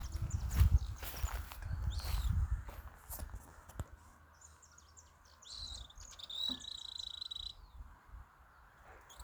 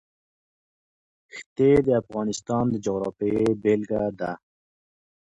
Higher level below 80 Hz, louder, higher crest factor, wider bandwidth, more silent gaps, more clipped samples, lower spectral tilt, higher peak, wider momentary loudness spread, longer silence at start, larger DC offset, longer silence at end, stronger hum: first, -44 dBFS vs -54 dBFS; second, -40 LUFS vs -24 LUFS; first, 24 dB vs 18 dB; first, over 20 kHz vs 9.8 kHz; second, none vs 1.46-1.56 s; neither; second, -4 dB/octave vs -7 dB/octave; second, -18 dBFS vs -8 dBFS; first, 23 LU vs 17 LU; second, 0 s vs 1.35 s; neither; second, 0 s vs 1.05 s; neither